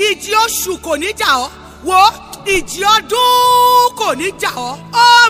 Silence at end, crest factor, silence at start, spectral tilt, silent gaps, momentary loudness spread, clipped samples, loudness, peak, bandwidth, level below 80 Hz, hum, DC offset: 0 s; 12 dB; 0 s; -1 dB/octave; none; 10 LU; 0.2%; -12 LUFS; 0 dBFS; 16.5 kHz; -44 dBFS; none; under 0.1%